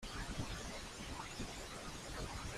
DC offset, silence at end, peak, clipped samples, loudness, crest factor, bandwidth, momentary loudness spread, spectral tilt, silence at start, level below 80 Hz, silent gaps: under 0.1%; 0 s; -28 dBFS; under 0.1%; -46 LUFS; 18 dB; 15.5 kHz; 3 LU; -3.5 dB/octave; 0 s; -52 dBFS; none